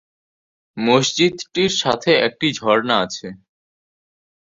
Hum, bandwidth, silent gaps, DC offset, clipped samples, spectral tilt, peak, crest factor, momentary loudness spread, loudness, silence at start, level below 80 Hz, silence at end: none; 7.8 kHz; none; under 0.1%; under 0.1%; -3.5 dB/octave; -2 dBFS; 18 dB; 11 LU; -18 LUFS; 0.75 s; -58 dBFS; 1.15 s